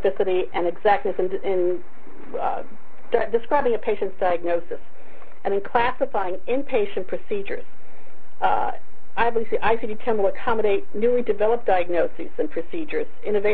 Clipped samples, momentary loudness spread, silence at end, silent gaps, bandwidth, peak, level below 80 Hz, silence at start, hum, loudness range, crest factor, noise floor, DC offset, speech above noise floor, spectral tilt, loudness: under 0.1%; 9 LU; 0 s; none; 4.8 kHz; -4 dBFS; -52 dBFS; 0 s; none; 3 LU; 18 dB; -51 dBFS; 10%; 28 dB; -4 dB/octave; -24 LUFS